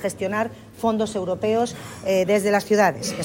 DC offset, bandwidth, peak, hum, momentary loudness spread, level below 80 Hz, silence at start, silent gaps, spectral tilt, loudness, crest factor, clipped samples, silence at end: under 0.1%; 16.5 kHz; -4 dBFS; none; 8 LU; -56 dBFS; 0 s; none; -4.5 dB/octave; -22 LUFS; 18 dB; under 0.1%; 0 s